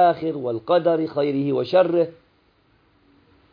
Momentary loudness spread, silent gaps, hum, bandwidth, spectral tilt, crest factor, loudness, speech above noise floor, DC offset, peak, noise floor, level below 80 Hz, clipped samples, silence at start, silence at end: 7 LU; none; none; 5.2 kHz; -9 dB/octave; 18 dB; -21 LUFS; 41 dB; under 0.1%; -4 dBFS; -61 dBFS; -68 dBFS; under 0.1%; 0 s; 1.4 s